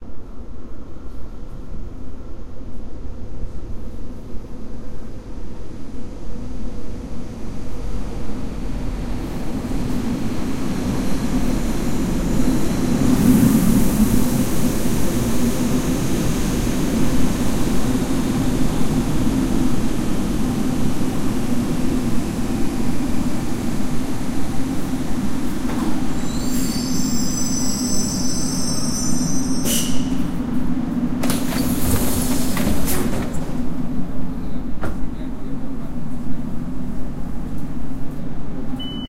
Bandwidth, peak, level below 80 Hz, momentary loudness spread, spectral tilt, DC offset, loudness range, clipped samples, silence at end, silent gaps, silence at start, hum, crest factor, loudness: 16 kHz; -2 dBFS; -30 dBFS; 16 LU; -5 dB/octave; under 0.1%; 17 LU; under 0.1%; 0 s; none; 0 s; none; 16 dB; -22 LUFS